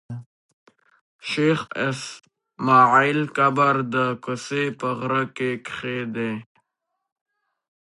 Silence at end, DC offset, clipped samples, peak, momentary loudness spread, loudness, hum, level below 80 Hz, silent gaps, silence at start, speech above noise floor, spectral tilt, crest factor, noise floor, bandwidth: 1.55 s; under 0.1%; under 0.1%; -4 dBFS; 15 LU; -22 LUFS; none; -68 dBFS; 0.26-0.66 s, 1.01-1.19 s; 0.1 s; 58 dB; -5.5 dB/octave; 20 dB; -80 dBFS; 11.5 kHz